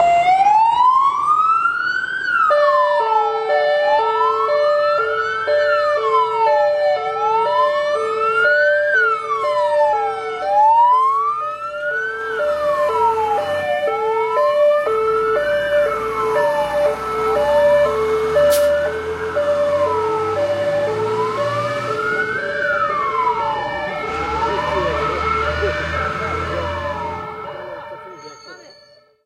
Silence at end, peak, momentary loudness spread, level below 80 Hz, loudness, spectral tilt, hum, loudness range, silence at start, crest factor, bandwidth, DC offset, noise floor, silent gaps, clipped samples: 0.55 s; -4 dBFS; 9 LU; -46 dBFS; -17 LUFS; -4 dB/octave; none; 5 LU; 0 s; 14 dB; 16 kHz; under 0.1%; -49 dBFS; none; under 0.1%